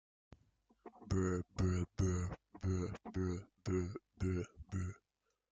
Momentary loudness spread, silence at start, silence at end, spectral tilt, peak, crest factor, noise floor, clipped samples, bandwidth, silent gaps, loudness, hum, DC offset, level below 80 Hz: 9 LU; 0.85 s; 0.55 s; -7 dB/octave; -24 dBFS; 16 dB; -86 dBFS; under 0.1%; 7.8 kHz; none; -41 LUFS; none; under 0.1%; -58 dBFS